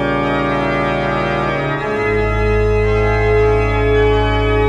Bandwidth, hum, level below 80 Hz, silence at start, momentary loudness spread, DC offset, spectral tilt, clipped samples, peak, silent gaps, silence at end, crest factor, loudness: 8.6 kHz; none; -22 dBFS; 0 s; 4 LU; under 0.1%; -7.5 dB/octave; under 0.1%; -2 dBFS; none; 0 s; 12 dB; -15 LUFS